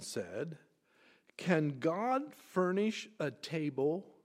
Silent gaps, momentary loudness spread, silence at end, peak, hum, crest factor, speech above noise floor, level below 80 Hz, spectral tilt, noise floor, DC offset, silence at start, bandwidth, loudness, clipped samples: none; 10 LU; 0.15 s; -14 dBFS; none; 22 dB; 33 dB; -84 dBFS; -6 dB/octave; -68 dBFS; under 0.1%; 0 s; 15.5 kHz; -36 LUFS; under 0.1%